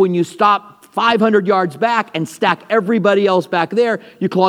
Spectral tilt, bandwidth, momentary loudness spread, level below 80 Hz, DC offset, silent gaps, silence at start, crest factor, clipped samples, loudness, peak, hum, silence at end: -6 dB/octave; 15 kHz; 6 LU; -72 dBFS; under 0.1%; none; 0 s; 14 dB; under 0.1%; -16 LUFS; 0 dBFS; none; 0 s